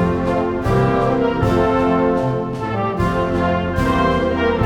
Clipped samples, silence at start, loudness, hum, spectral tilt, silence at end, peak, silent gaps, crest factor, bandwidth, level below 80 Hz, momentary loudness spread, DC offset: under 0.1%; 0 s; -18 LUFS; none; -7.5 dB/octave; 0 s; -4 dBFS; none; 12 dB; 15.5 kHz; -32 dBFS; 5 LU; under 0.1%